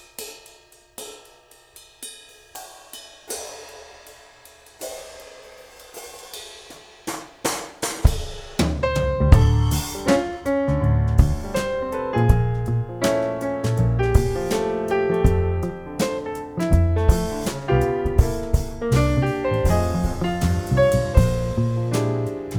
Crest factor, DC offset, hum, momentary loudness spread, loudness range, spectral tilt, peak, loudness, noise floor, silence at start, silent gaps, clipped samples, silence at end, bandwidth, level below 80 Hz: 22 dB; under 0.1%; none; 20 LU; 17 LU; -6 dB/octave; 0 dBFS; -22 LUFS; -51 dBFS; 0.2 s; none; under 0.1%; 0 s; 19 kHz; -26 dBFS